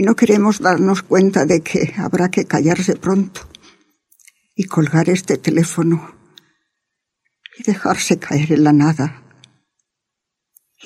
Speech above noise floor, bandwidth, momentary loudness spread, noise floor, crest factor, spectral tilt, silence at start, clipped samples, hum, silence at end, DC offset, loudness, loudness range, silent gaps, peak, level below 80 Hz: 65 dB; 14.5 kHz; 9 LU; -80 dBFS; 16 dB; -6 dB/octave; 0 s; under 0.1%; none; 1.7 s; under 0.1%; -16 LUFS; 4 LU; none; 0 dBFS; -54 dBFS